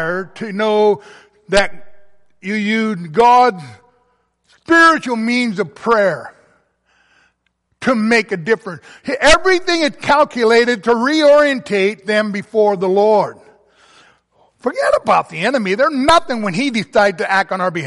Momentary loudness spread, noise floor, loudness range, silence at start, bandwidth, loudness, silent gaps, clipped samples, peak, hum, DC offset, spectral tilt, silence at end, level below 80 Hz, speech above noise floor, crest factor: 12 LU; -66 dBFS; 5 LU; 0 s; 11.5 kHz; -14 LUFS; none; under 0.1%; 0 dBFS; none; under 0.1%; -4.5 dB/octave; 0 s; -42 dBFS; 52 dB; 16 dB